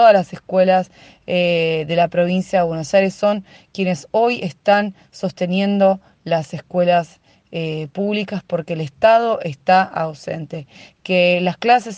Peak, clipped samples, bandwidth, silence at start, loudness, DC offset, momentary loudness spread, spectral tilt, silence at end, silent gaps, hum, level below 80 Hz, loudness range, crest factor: 0 dBFS; under 0.1%; 9.2 kHz; 0 s; -18 LUFS; under 0.1%; 12 LU; -6 dB/octave; 0 s; none; none; -60 dBFS; 2 LU; 16 dB